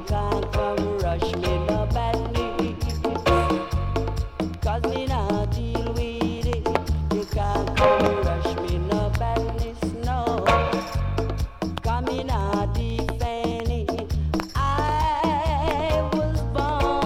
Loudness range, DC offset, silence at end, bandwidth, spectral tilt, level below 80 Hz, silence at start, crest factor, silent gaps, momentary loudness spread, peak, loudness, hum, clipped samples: 3 LU; under 0.1%; 0 s; 15 kHz; -6.5 dB/octave; -30 dBFS; 0 s; 20 dB; none; 6 LU; -4 dBFS; -25 LUFS; none; under 0.1%